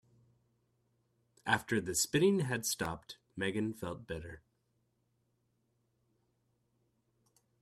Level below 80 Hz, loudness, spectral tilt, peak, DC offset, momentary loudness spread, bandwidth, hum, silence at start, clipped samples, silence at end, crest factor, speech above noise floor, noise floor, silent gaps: -66 dBFS; -34 LUFS; -4 dB/octave; -14 dBFS; under 0.1%; 15 LU; 15 kHz; 60 Hz at -65 dBFS; 1.45 s; under 0.1%; 3.25 s; 26 dB; 44 dB; -79 dBFS; none